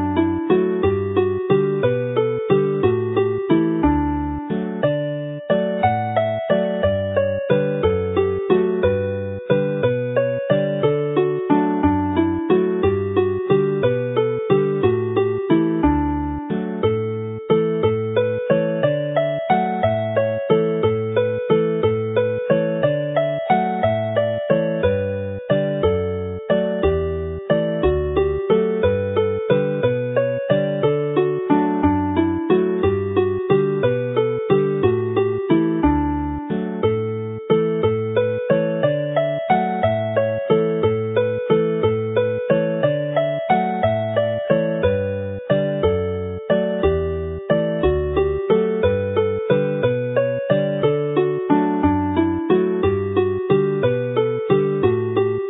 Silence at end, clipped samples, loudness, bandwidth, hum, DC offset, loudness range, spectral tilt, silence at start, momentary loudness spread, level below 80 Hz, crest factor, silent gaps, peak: 0 s; under 0.1%; -20 LUFS; 4 kHz; none; under 0.1%; 2 LU; -12.5 dB/octave; 0 s; 3 LU; -38 dBFS; 16 dB; none; -2 dBFS